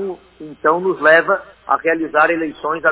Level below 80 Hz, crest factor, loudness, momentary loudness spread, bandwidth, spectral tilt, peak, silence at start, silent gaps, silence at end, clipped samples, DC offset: -58 dBFS; 16 dB; -16 LUFS; 10 LU; 4 kHz; -8.5 dB/octave; 0 dBFS; 0 s; none; 0 s; under 0.1%; under 0.1%